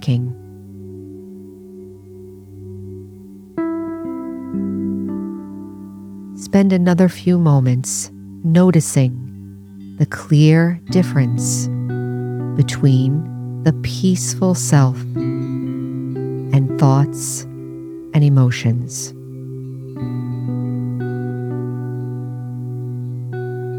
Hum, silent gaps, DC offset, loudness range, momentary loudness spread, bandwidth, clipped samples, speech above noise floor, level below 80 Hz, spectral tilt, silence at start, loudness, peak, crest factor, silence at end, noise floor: none; none; under 0.1%; 10 LU; 22 LU; 15.5 kHz; under 0.1%; 23 dB; -54 dBFS; -6.5 dB/octave; 0 s; -18 LUFS; -2 dBFS; 18 dB; 0 s; -38 dBFS